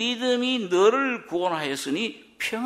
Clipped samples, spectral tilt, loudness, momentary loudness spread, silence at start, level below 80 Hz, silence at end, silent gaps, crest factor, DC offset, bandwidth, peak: under 0.1%; -3.5 dB/octave; -24 LUFS; 9 LU; 0 s; -70 dBFS; 0 s; none; 18 dB; under 0.1%; 15.5 kHz; -8 dBFS